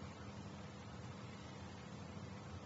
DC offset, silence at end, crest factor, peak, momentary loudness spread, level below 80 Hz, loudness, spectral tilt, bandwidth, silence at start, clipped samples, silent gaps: under 0.1%; 0 s; 14 dB; -38 dBFS; 1 LU; -66 dBFS; -52 LUFS; -5.5 dB/octave; 7.6 kHz; 0 s; under 0.1%; none